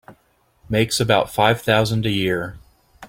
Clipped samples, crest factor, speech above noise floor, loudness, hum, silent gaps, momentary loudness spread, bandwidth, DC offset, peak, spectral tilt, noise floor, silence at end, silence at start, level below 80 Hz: under 0.1%; 20 dB; 42 dB; -19 LUFS; none; none; 8 LU; 16.5 kHz; under 0.1%; -2 dBFS; -4.5 dB/octave; -61 dBFS; 0 s; 0.1 s; -46 dBFS